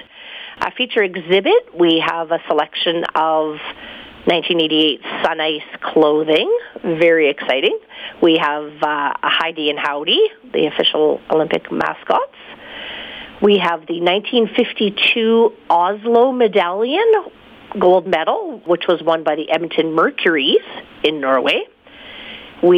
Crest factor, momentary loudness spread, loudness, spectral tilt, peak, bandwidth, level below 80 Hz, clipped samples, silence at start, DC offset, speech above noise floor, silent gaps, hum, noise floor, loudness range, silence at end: 14 dB; 15 LU; -16 LUFS; -6 dB/octave; -2 dBFS; 7.2 kHz; -58 dBFS; under 0.1%; 0.15 s; under 0.1%; 21 dB; none; none; -38 dBFS; 3 LU; 0 s